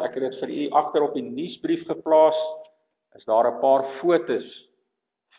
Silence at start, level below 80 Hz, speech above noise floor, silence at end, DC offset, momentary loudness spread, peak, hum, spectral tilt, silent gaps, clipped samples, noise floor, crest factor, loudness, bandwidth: 0 s; -74 dBFS; 57 dB; 0.8 s; under 0.1%; 14 LU; -6 dBFS; none; -9.5 dB/octave; none; under 0.1%; -79 dBFS; 18 dB; -23 LUFS; 4 kHz